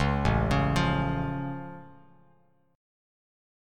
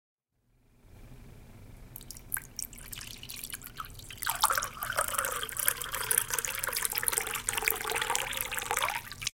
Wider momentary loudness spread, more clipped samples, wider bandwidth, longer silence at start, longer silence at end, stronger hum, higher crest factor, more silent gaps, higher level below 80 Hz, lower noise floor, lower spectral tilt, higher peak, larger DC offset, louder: about the same, 16 LU vs 14 LU; neither; second, 12 kHz vs 17 kHz; second, 0 s vs 0.85 s; first, 1.85 s vs 0.05 s; neither; second, 18 dB vs 34 dB; neither; first, -38 dBFS vs -54 dBFS; second, -65 dBFS vs -71 dBFS; first, -7 dB/octave vs 0 dB/octave; second, -10 dBFS vs 0 dBFS; neither; first, -27 LUFS vs -31 LUFS